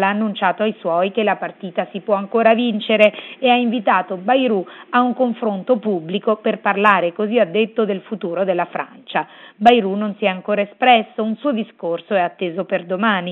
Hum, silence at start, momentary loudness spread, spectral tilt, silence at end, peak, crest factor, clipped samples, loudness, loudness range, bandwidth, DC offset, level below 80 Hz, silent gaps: none; 0 s; 10 LU; -7.5 dB/octave; 0 s; 0 dBFS; 18 dB; under 0.1%; -18 LUFS; 2 LU; 5.2 kHz; under 0.1%; -66 dBFS; none